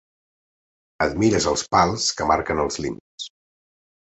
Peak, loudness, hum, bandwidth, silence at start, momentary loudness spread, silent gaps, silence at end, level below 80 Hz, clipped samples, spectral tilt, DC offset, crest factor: -4 dBFS; -21 LUFS; none; 8.2 kHz; 1 s; 16 LU; 3.00-3.18 s; 0.9 s; -44 dBFS; under 0.1%; -4 dB/octave; under 0.1%; 20 dB